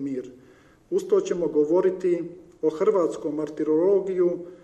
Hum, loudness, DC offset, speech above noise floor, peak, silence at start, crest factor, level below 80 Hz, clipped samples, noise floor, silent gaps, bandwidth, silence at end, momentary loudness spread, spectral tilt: none; -24 LUFS; under 0.1%; 28 dB; -10 dBFS; 0 s; 14 dB; -66 dBFS; under 0.1%; -51 dBFS; none; 8.6 kHz; 0.05 s; 9 LU; -7 dB/octave